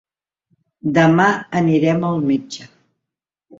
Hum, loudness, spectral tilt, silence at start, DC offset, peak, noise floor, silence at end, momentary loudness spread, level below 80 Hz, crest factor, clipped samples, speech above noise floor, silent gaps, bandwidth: none; -17 LUFS; -7 dB/octave; 0.85 s; under 0.1%; -2 dBFS; -84 dBFS; 0.95 s; 14 LU; -58 dBFS; 16 dB; under 0.1%; 68 dB; none; 7.8 kHz